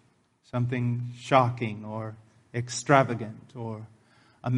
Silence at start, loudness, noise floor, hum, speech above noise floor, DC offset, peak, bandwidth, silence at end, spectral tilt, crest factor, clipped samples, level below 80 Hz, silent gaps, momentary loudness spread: 0.55 s; -28 LUFS; -64 dBFS; none; 37 dB; under 0.1%; -4 dBFS; 10.5 kHz; 0 s; -6 dB/octave; 24 dB; under 0.1%; -66 dBFS; none; 16 LU